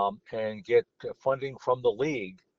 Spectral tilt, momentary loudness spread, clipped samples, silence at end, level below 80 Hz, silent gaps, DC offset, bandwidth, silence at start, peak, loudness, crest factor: -4.5 dB/octave; 8 LU; under 0.1%; 0.25 s; -68 dBFS; none; under 0.1%; 7 kHz; 0 s; -12 dBFS; -29 LUFS; 18 dB